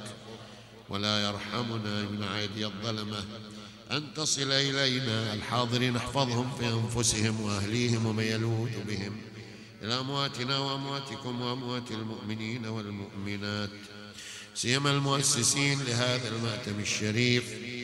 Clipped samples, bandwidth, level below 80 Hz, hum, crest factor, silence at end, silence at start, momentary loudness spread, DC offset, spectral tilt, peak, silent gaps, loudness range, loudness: under 0.1%; 13.5 kHz; -60 dBFS; none; 22 dB; 0 s; 0 s; 16 LU; under 0.1%; -3.5 dB/octave; -10 dBFS; none; 6 LU; -30 LUFS